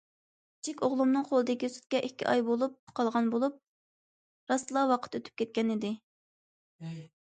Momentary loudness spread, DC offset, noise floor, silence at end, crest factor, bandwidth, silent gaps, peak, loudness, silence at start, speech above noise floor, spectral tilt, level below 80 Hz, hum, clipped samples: 13 LU; under 0.1%; under -90 dBFS; 0.2 s; 18 dB; 9.4 kHz; 2.79-2.87 s, 3.68-4.47 s, 6.03-6.79 s; -14 dBFS; -31 LUFS; 0.65 s; over 60 dB; -5 dB/octave; -78 dBFS; none; under 0.1%